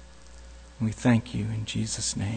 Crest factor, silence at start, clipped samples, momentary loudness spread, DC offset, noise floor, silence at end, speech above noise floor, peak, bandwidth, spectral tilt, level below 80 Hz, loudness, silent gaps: 18 dB; 0 s; under 0.1%; 24 LU; under 0.1%; -48 dBFS; 0 s; 21 dB; -12 dBFS; 9.4 kHz; -5 dB/octave; -48 dBFS; -28 LUFS; none